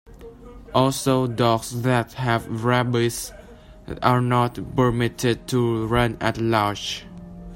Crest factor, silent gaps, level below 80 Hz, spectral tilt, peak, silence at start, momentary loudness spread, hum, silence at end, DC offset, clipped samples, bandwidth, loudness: 20 dB; none; -44 dBFS; -5.5 dB/octave; -2 dBFS; 0.1 s; 10 LU; none; 0 s; under 0.1%; under 0.1%; 16.5 kHz; -22 LUFS